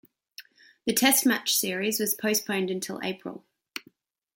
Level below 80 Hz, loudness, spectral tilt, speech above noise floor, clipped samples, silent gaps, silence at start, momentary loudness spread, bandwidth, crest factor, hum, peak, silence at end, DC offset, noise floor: -72 dBFS; -25 LUFS; -2 dB/octave; 35 dB; under 0.1%; none; 0.4 s; 20 LU; 17 kHz; 22 dB; none; -6 dBFS; 0.55 s; under 0.1%; -62 dBFS